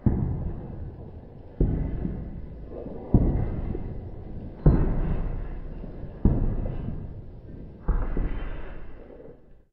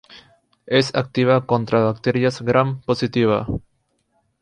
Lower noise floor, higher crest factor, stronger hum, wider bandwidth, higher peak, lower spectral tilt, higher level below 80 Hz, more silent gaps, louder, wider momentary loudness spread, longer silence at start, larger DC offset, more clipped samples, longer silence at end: second, -48 dBFS vs -68 dBFS; about the same, 22 dB vs 18 dB; neither; second, 3.3 kHz vs 10.5 kHz; about the same, -4 dBFS vs -2 dBFS; first, -10.5 dB/octave vs -6.5 dB/octave; first, -30 dBFS vs -48 dBFS; neither; second, -30 LUFS vs -19 LUFS; first, 19 LU vs 5 LU; about the same, 0 s vs 0.1 s; neither; neither; second, 0.15 s vs 0.8 s